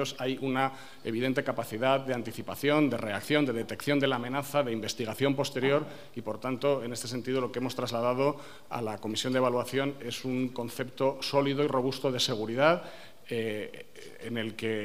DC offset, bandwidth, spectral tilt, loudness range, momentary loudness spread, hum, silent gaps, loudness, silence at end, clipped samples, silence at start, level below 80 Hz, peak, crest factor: 0.4%; 15.5 kHz; -5 dB/octave; 2 LU; 10 LU; none; none; -30 LUFS; 0 s; under 0.1%; 0 s; -70 dBFS; -8 dBFS; 22 dB